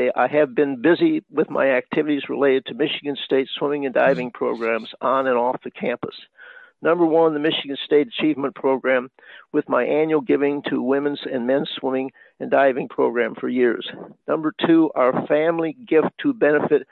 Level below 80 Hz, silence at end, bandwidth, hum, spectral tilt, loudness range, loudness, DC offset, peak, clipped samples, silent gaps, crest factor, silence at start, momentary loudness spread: -70 dBFS; 0.1 s; 4.6 kHz; none; -8 dB/octave; 2 LU; -21 LUFS; under 0.1%; -4 dBFS; under 0.1%; none; 16 dB; 0 s; 8 LU